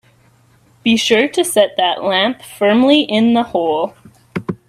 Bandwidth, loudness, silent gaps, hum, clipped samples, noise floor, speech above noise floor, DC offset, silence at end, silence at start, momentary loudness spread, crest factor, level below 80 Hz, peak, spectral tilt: 14 kHz; -14 LUFS; none; none; under 0.1%; -52 dBFS; 38 dB; under 0.1%; 0.15 s; 0.85 s; 10 LU; 16 dB; -58 dBFS; 0 dBFS; -4 dB/octave